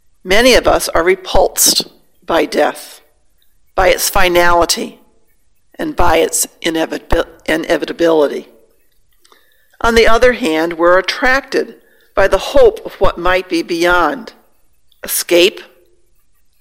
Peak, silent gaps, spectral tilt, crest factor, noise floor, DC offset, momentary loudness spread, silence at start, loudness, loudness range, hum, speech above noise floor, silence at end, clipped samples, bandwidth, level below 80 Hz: 0 dBFS; none; -2.5 dB/octave; 14 dB; -58 dBFS; under 0.1%; 9 LU; 0.25 s; -13 LUFS; 4 LU; none; 46 dB; 0.95 s; 0.2%; 17 kHz; -28 dBFS